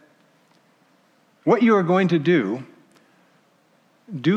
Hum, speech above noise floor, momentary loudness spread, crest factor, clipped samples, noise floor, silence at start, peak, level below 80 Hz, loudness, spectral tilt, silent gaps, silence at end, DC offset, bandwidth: none; 42 dB; 13 LU; 18 dB; under 0.1%; -60 dBFS; 1.45 s; -6 dBFS; -80 dBFS; -20 LUFS; -8 dB/octave; none; 0 s; under 0.1%; 8 kHz